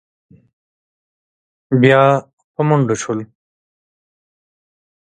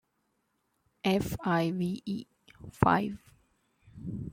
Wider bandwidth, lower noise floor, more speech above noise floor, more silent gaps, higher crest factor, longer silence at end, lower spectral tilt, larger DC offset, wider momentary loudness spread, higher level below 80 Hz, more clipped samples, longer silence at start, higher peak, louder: second, 9.2 kHz vs 16.5 kHz; first, under -90 dBFS vs -77 dBFS; first, over 77 dB vs 47 dB; first, 2.33-2.37 s, 2.44-2.54 s vs none; second, 18 dB vs 28 dB; first, 1.8 s vs 0 s; about the same, -6.5 dB/octave vs -6.5 dB/octave; neither; second, 14 LU vs 19 LU; second, -62 dBFS vs -54 dBFS; neither; first, 1.7 s vs 1.05 s; first, 0 dBFS vs -6 dBFS; first, -15 LUFS vs -31 LUFS